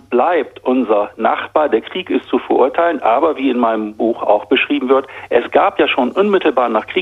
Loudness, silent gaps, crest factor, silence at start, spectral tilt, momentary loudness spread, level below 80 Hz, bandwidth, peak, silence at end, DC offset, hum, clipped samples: -15 LUFS; none; 14 dB; 0.1 s; -6.5 dB/octave; 4 LU; -58 dBFS; 6.2 kHz; 0 dBFS; 0 s; under 0.1%; none; under 0.1%